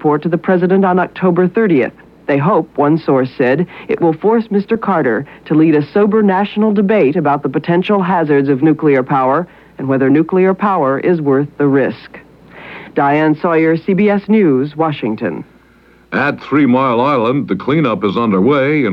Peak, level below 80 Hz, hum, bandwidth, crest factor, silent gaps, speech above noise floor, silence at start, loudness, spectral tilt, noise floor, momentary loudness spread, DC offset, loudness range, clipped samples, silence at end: 0 dBFS; -54 dBFS; none; 5.6 kHz; 12 dB; none; 34 dB; 0 s; -13 LUFS; -9.5 dB/octave; -46 dBFS; 6 LU; under 0.1%; 2 LU; under 0.1%; 0 s